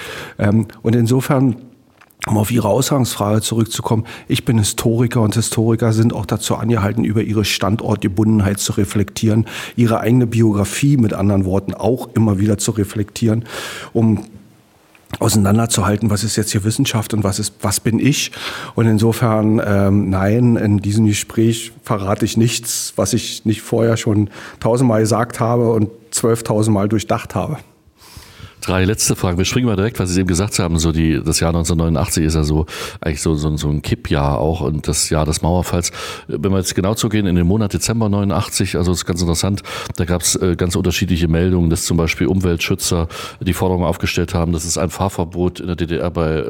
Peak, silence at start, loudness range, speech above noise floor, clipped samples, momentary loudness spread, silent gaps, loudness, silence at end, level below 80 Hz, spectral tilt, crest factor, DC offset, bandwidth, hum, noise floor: 0 dBFS; 0 s; 3 LU; 34 dB; under 0.1%; 6 LU; none; -17 LUFS; 0 s; -36 dBFS; -5.5 dB/octave; 16 dB; under 0.1%; 17 kHz; none; -50 dBFS